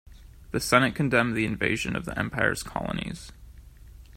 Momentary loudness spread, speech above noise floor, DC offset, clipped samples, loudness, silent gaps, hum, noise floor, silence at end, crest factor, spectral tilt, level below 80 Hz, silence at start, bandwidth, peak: 12 LU; 21 dB; under 0.1%; under 0.1%; -26 LUFS; none; none; -48 dBFS; 0 s; 24 dB; -5 dB/octave; -46 dBFS; 0.1 s; 16 kHz; -4 dBFS